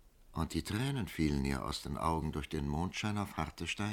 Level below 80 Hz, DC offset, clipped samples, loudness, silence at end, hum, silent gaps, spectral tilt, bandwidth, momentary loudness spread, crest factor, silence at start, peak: -48 dBFS; under 0.1%; under 0.1%; -37 LUFS; 0 s; none; none; -5.5 dB/octave; 17.5 kHz; 5 LU; 18 dB; 0.05 s; -18 dBFS